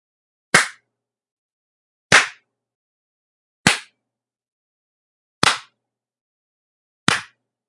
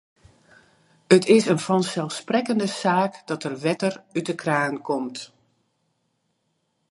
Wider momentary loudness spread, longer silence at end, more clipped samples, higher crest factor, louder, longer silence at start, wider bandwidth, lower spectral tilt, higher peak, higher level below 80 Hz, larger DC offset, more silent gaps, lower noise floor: about the same, 12 LU vs 12 LU; second, 0.45 s vs 1.65 s; neither; about the same, 24 dB vs 24 dB; first, -18 LUFS vs -23 LUFS; second, 0.55 s vs 1.1 s; about the same, 12 kHz vs 11.5 kHz; second, -1.5 dB/octave vs -5 dB/octave; about the same, 0 dBFS vs -2 dBFS; first, -58 dBFS vs -70 dBFS; neither; first, 1.32-2.10 s, 2.75-3.64 s, 4.52-5.42 s, 6.21-7.07 s vs none; first, -84 dBFS vs -73 dBFS